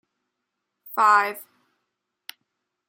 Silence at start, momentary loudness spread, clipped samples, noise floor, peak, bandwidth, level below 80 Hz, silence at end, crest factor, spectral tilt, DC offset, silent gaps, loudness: 0.85 s; 26 LU; under 0.1%; -81 dBFS; -6 dBFS; 17 kHz; under -90 dBFS; 1.45 s; 20 dB; -1.5 dB/octave; under 0.1%; none; -20 LUFS